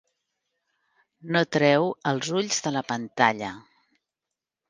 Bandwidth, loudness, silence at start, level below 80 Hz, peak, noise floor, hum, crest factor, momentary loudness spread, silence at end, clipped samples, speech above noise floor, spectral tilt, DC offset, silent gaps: 10.5 kHz; -24 LUFS; 1.25 s; -70 dBFS; -2 dBFS; -88 dBFS; none; 24 dB; 12 LU; 1.1 s; under 0.1%; 63 dB; -4 dB/octave; under 0.1%; none